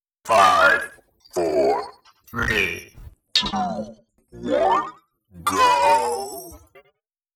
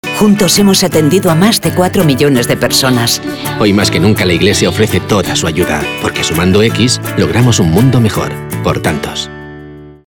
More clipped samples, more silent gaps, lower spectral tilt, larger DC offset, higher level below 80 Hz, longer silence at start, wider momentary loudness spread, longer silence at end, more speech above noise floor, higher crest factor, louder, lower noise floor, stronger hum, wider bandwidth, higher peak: neither; neither; second, -3 dB/octave vs -4.5 dB/octave; neither; second, -48 dBFS vs -38 dBFS; first, 0.25 s vs 0.05 s; first, 18 LU vs 8 LU; first, 0.8 s vs 0.15 s; first, 47 dB vs 21 dB; first, 20 dB vs 10 dB; second, -20 LUFS vs -10 LUFS; first, -67 dBFS vs -31 dBFS; neither; about the same, 19.5 kHz vs over 20 kHz; about the same, -2 dBFS vs 0 dBFS